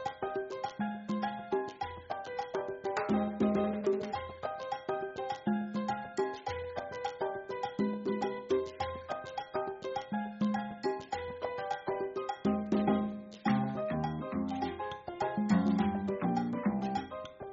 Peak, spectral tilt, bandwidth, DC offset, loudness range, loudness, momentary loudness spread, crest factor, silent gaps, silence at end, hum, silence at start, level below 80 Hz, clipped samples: -16 dBFS; -6 dB/octave; 7.6 kHz; under 0.1%; 4 LU; -35 LUFS; 9 LU; 18 dB; none; 0 s; none; 0 s; -66 dBFS; under 0.1%